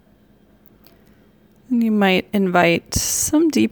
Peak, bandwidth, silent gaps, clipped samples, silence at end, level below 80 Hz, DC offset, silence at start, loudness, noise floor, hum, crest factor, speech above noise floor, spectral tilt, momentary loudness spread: -2 dBFS; over 20 kHz; none; under 0.1%; 0.05 s; -42 dBFS; under 0.1%; 1.7 s; -17 LUFS; -53 dBFS; none; 18 dB; 36 dB; -4 dB/octave; 4 LU